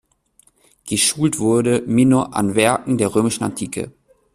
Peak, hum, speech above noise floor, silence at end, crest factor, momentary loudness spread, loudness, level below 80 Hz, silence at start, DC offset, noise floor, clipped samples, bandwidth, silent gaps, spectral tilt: -2 dBFS; none; 40 dB; 0.45 s; 18 dB; 11 LU; -18 LUFS; -52 dBFS; 0.85 s; under 0.1%; -57 dBFS; under 0.1%; 13.5 kHz; none; -4.5 dB/octave